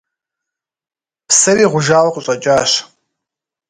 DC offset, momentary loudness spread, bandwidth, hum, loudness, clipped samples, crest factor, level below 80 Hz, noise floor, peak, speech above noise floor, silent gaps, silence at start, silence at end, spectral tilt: under 0.1%; 7 LU; 11 kHz; none; -12 LUFS; under 0.1%; 16 dB; -56 dBFS; -83 dBFS; 0 dBFS; 71 dB; none; 1.3 s; 0.85 s; -2.5 dB/octave